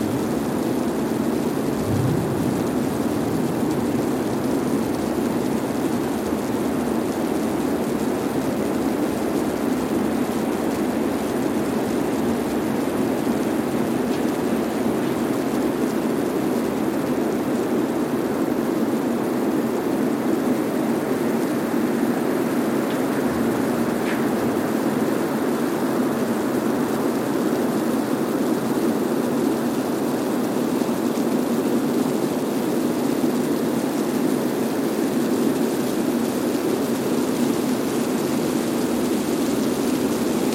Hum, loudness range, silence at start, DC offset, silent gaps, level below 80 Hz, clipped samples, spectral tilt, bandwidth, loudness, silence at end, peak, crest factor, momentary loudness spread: none; 1 LU; 0 s; under 0.1%; none; -52 dBFS; under 0.1%; -5.5 dB/octave; 16.5 kHz; -22 LUFS; 0 s; -6 dBFS; 16 dB; 2 LU